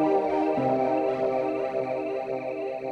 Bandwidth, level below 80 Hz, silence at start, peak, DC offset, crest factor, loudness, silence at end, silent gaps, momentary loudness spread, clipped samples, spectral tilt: 8.2 kHz; -64 dBFS; 0 s; -14 dBFS; under 0.1%; 12 dB; -27 LUFS; 0 s; none; 7 LU; under 0.1%; -8 dB/octave